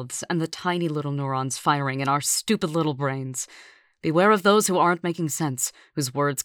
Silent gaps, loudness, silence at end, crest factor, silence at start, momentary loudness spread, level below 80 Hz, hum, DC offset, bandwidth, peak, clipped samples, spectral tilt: none; -24 LUFS; 0 s; 20 dB; 0 s; 10 LU; -68 dBFS; none; under 0.1%; over 20 kHz; -4 dBFS; under 0.1%; -4.5 dB/octave